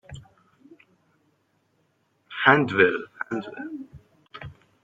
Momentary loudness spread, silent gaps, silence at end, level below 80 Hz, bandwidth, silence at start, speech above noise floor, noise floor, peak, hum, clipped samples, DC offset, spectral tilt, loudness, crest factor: 27 LU; none; 0.3 s; -62 dBFS; 7.8 kHz; 0.1 s; 47 dB; -69 dBFS; -2 dBFS; none; under 0.1%; under 0.1%; -6.5 dB/octave; -22 LUFS; 26 dB